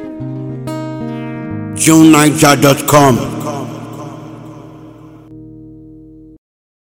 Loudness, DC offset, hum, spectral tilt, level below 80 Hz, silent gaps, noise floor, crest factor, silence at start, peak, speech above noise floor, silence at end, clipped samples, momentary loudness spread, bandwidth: -11 LUFS; under 0.1%; 50 Hz at -40 dBFS; -4.5 dB/octave; -46 dBFS; none; -37 dBFS; 14 dB; 0 s; 0 dBFS; 29 dB; 0.95 s; 0.9%; 23 LU; over 20 kHz